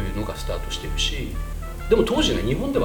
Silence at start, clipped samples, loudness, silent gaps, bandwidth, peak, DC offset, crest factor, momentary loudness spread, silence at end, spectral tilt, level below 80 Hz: 0 s; under 0.1%; -24 LUFS; none; 19 kHz; -6 dBFS; 0.3%; 18 dB; 12 LU; 0 s; -4.5 dB/octave; -30 dBFS